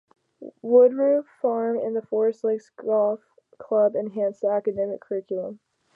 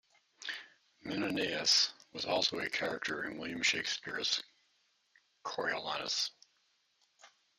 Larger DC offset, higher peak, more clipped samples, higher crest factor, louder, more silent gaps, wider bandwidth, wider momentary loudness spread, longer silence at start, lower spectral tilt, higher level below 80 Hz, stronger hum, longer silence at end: neither; first, -6 dBFS vs -14 dBFS; neither; second, 18 dB vs 24 dB; first, -23 LUFS vs -34 LUFS; neither; second, 2.6 kHz vs 14 kHz; about the same, 13 LU vs 15 LU; about the same, 0.4 s vs 0.4 s; first, -9 dB/octave vs -1.5 dB/octave; about the same, -74 dBFS vs -76 dBFS; neither; about the same, 0.4 s vs 0.3 s